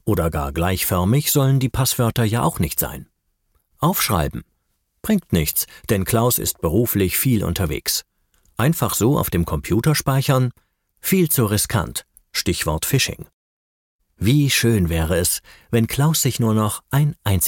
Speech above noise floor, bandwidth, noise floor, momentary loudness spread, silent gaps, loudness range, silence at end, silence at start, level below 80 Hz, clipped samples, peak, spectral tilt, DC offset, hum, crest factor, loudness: 51 dB; 17 kHz; -70 dBFS; 7 LU; 13.34-13.99 s; 3 LU; 0 s; 0.05 s; -38 dBFS; under 0.1%; -4 dBFS; -5 dB/octave; under 0.1%; none; 16 dB; -19 LUFS